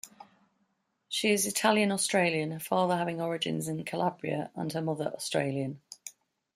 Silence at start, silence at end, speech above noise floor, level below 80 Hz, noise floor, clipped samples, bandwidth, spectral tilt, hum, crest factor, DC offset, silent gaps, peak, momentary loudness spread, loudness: 0.05 s; 0.45 s; 46 dB; -74 dBFS; -76 dBFS; under 0.1%; 15.5 kHz; -4 dB/octave; none; 20 dB; under 0.1%; none; -10 dBFS; 12 LU; -30 LUFS